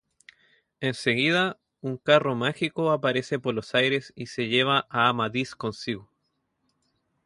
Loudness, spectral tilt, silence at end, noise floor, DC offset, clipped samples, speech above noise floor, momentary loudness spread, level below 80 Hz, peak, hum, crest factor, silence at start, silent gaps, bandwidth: -25 LUFS; -5 dB/octave; 1.2 s; -76 dBFS; under 0.1%; under 0.1%; 51 dB; 11 LU; -66 dBFS; -6 dBFS; none; 20 dB; 0.8 s; none; 11.5 kHz